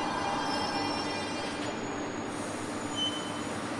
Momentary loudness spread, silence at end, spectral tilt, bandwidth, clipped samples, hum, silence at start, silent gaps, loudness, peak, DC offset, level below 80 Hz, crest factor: 5 LU; 0 s; -3.5 dB/octave; 11.5 kHz; under 0.1%; none; 0 s; none; -33 LUFS; -18 dBFS; under 0.1%; -60 dBFS; 14 dB